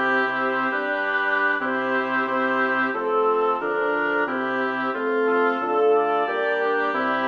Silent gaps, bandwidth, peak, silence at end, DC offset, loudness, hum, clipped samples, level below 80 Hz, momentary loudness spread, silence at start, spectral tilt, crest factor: none; 6.6 kHz; -10 dBFS; 0 s; under 0.1%; -22 LUFS; none; under 0.1%; -70 dBFS; 3 LU; 0 s; -5.5 dB/octave; 12 dB